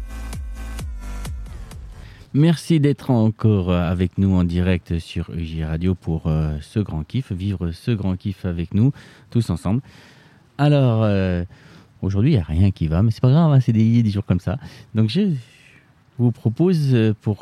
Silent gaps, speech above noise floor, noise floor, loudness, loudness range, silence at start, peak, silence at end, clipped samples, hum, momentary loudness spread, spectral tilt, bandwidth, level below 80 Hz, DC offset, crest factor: none; 33 dB; -52 dBFS; -20 LUFS; 5 LU; 0 s; -4 dBFS; 0.05 s; under 0.1%; none; 16 LU; -8.5 dB/octave; 12.5 kHz; -36 dBFS; under 0.1%; 16 dB